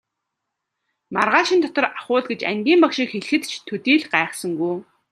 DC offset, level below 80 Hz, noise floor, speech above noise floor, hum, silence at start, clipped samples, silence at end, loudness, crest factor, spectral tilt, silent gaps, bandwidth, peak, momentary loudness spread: under 0.1%; -72 dBFS; -80 dBFS; 60 dB; none; 1.1 s; under 0.1%; 0.3 s; -20 LUFS; 20 dB; -4 dB/octave; none; 13 kHz; 0 dBFS; 9 LU